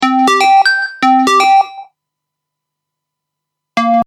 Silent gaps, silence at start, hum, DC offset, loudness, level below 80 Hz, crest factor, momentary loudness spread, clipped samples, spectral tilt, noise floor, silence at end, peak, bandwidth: none; 0 s; none; under 0.1%; -10 LUFS; -66 dBFS; 12 dB; 9 LU; under 0.1%; -2.5 dB/octave; -78 dBFS; 0 s; 0 dBFS; 14.5 kHz